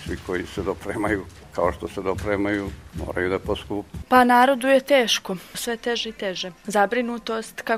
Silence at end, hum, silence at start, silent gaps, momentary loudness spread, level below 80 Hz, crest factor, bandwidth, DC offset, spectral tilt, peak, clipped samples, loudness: 0 s; none; 0 s; none; 13 LU; -44 dBFS; 20 dB; 16 kHz; under 0.1%; -4 dB/octave; -2 dBFS; under 0.1%; -23 LUFS